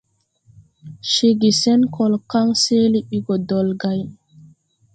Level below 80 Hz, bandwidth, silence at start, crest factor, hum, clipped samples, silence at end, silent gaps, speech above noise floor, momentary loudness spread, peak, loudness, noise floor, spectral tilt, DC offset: -58 dBFS; 9.2 kHz; 0.85 s; 14 dB; none; under 0.1%; 0.8 s; none; 40 dB; 9 LU; -4 dBFS; -18 LUFS; -57 dBFS; -5 dB/octave; under 0.1%